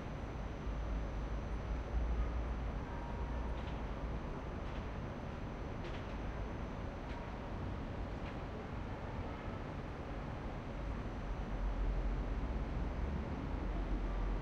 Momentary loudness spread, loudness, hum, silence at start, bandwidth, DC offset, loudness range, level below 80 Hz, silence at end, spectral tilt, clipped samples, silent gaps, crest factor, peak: 4 LU; -43 LUFS; none; 0 s; 7 kHz; under 0.1%; 3 LU; -42 dBFS; 0 s; -7.5 dB/octave; under 0.1%; none; 14 dB; -26 dBFS